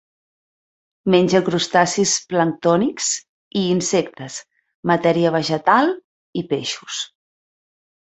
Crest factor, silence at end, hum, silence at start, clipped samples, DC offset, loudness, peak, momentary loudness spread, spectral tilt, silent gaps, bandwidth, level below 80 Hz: 20 dB; 0.95 s; none; 1.05 s; under 0.1%; under 0.1%; -19 LUFS; 0 dBFS; 14 LU; -4 dB/octave; 3.29-3.51 s, 4.75-4.83 s, 6.04-6.33 s; 8.2 kHz; -62 dBFS